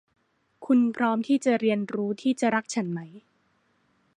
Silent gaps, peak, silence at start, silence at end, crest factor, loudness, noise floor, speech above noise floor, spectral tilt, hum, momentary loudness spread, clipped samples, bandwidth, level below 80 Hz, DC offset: none; -10 dBFS; 0.6 s; 0.95 s; 18 dB; -25 LUFS; -68 dBFS; 44 dB; -5.5 dB/octave; none; 12 LU; under 0.1%; 10.5 kHz; -76 dBFS; under 0.1%